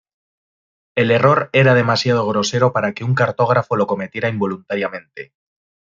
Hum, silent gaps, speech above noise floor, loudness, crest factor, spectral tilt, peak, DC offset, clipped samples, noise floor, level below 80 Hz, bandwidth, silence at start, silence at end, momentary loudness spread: none; none; over 73 dB; -17 LUFS; 16 dB; -6 dB/octave; -2 dBFS; under 0.1%; under 0.1%; under -90 dBFS; -60 dBFS; 7.6 kHz; 0.95 s; 0.7 s; 11 LU